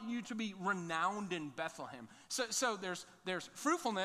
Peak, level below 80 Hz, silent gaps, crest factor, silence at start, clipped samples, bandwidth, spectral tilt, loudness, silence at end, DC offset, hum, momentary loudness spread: -22 dBFS; -82 dBFS; none; 18 dB; 0 s; under 0.1%; 15.5 kHz; -3 dB/octave; -39 LUFS; 0 s; under 0.1%; none; 9 LU